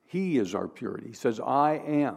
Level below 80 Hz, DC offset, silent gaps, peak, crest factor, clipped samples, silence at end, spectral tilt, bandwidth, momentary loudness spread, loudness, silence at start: -76 dBFS; under 0.1%; none; -12 dBFS; 16 dB; under 0.1%; 0 s; -7 dB/octave; 13 kHz; 11 LU; -28 LUFS; 0.15 s